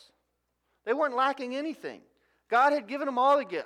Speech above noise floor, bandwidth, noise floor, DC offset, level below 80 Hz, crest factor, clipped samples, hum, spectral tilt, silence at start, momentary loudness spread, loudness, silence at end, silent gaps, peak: 51 dB; 12 kHz; -78 dBFS; under 0.1%; -84 dBFS; 18 dB; under 0.1%; 60 Hz at -80 dBFS; -4 dB/octave; 0.85 s; 15 LU; -27 LUFS; 0 s; none; -12 dBFS